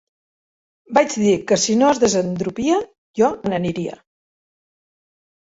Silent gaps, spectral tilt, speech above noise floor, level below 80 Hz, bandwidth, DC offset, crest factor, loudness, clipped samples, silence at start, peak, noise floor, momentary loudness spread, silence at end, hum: 2.98-3.14 s; -4.5 dB/octave; over 72 dB; -56 dBFS; 8 kHz; under 0.1%; 18 dB; -19 LUFS; under 0.1%; 0.9 s; -2 dBFS; under -90 dBFS; 9 LU; 1.65 s; none